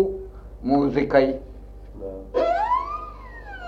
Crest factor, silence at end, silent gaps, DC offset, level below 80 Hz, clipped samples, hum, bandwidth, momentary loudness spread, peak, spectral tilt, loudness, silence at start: 20 dB; 0 s; none; under 0.1%; -40 dBFS; under 0.1%; 50 Hz at -40 dBFS; 7.4 kHz; 21 LU; -4 dBFS; -8 dB/octave; -23 LUFS; 0 s